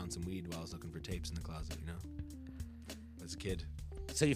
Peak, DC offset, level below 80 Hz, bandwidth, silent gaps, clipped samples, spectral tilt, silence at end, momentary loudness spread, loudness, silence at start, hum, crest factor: -18 dBFS; under 0.1%; -50 dBFS; 15.5 kHz; none; under 0.1%; -5 dB/octave; 0 s; 7 LU; -44 LUFS; 0 s; none; 24 dB